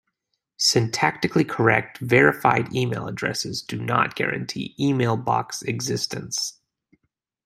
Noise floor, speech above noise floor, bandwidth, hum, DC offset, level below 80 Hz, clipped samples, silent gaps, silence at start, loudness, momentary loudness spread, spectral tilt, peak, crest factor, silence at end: -78 dBFS; 55 dB; 15.5 kHz; none; under 0.1%; -60 dBFS; under 0.1%; none; 0.6 s; -22 LUFS; 10 LU; -4 dB/octave; -2 dBFS; 22 dB; 0.95 s